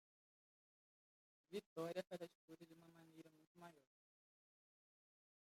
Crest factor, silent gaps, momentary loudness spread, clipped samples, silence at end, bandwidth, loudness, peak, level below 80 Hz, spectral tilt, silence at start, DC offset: 24 dB; 1.66-1.76 s, 2.35-2.48 s, 3.47-3.55 s; 17 LU; under 0.1%; 1.65 s; 16 kHz; -54 LUFS; -34 dBFS; under -90 dBFS; -5.5 dB/octave; 1.5 s; under 0.1%